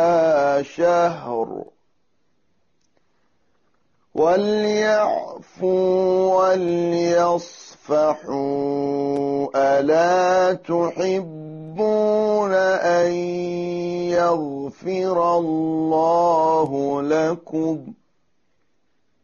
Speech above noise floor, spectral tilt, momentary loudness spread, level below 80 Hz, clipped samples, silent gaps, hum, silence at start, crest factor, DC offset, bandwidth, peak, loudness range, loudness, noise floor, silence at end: 51 dB; -5 dB/octave; 9 LU; -62 dBFS; under 0.1%; none; none; 0 s; 12 dB; under 0.1%; 7.2 kHz; -8 dBFS; 4 LU; -20 LUFS; -71 dBFS; 1.3 s